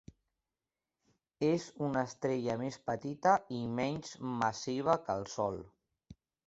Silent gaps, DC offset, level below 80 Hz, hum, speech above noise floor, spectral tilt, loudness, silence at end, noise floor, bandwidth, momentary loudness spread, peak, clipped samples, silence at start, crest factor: none; under 0.1%; -68 dBFS; none; over 56 dB; -5.5 dB/octave; -35 LUFS; 0.35 s; under -90 dBFS; 8 kHz; 8 LU; -14 dBFS; under 0.1%; 1.4 s; 22 dB